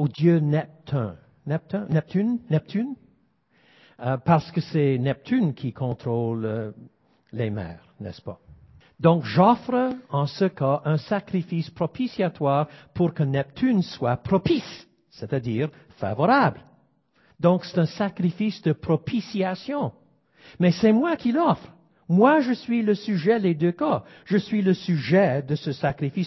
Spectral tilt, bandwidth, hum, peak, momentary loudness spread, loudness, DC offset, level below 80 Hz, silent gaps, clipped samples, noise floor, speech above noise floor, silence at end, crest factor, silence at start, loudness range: -8.5 dB/octave; 6 kHz; none; -4 dBFS; 11 LU; -24 LUFS; under 0.1%; -56 dBFS; none; under 0.1%; -64 dBFS; 41 dB; 0 s; 20 dB; 0 s; 5 LU